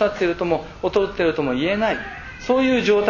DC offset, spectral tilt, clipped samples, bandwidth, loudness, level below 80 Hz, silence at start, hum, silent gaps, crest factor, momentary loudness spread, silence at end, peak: under 0.1%; -6 dB/octave; under 0.1%; 7.4 kHz; -21 LUFS; -44 dBFS; 0 s; none; none; 16 dB; 8 LU; 0 s; -4 dBFS